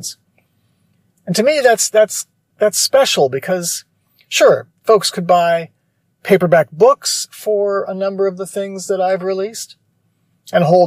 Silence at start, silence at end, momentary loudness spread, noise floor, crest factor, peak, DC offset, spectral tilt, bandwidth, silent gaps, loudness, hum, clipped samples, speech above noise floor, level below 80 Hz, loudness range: 0 s; 0 s; 12 LU; -64 dBFS; 16 dB; 0 dBFS; under 0.1%; -3.5 dB/octave; 15.5 kHz; none; -15 LUFS; none; under 0.1%; 50 dB; -66 dBFS; 5 LU